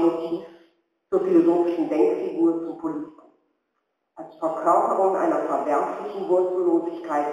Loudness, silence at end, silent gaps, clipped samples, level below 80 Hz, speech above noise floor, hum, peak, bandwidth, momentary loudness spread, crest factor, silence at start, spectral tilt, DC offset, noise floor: -23 LUFS; 0 s; none; under 0.1%; -76 dBFS; 54 dB; none; -6 dBFS; 9.6 kHz; 12 LU; 16 dB; 0 s; -7 dB/octave; under 0.1%; -76 dBFS